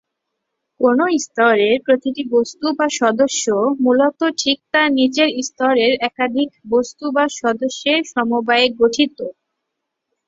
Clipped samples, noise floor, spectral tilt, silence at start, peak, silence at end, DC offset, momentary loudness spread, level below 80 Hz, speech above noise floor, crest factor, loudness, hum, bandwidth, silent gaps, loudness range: under 0.1%; -78 dBFS; -2.5 dB/octave; 0.8 s; -2 dBFS; 0.95 s; under 0.1%; 5 LU; -62 dBFS; 61 dB; 16 dB; -17 LUFS; none; 7.8 kHz; none; 2 LU